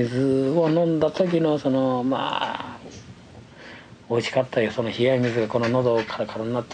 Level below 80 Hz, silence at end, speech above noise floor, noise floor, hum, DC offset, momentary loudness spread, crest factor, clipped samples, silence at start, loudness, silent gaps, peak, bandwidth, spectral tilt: -60 dBFS; 0 s; 23 dB; -45 dBFS; none; under 0.1%; 20 LU; 16 dB; under 0.1%; 0 s; -23 LUFS; none; -8 dBFS; 9.6 kHz; -7 dB/octave